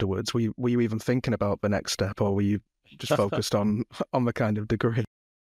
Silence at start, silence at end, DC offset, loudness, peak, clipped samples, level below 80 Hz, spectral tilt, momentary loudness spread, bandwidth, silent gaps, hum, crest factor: 0 s; 0.55 s; under 0.1%; -27 LUFS; -10 dBFS; under 0.1%; -54 dBFS; -6 dB/octave; 4 LU; 15 kHz; none; none; 16 dB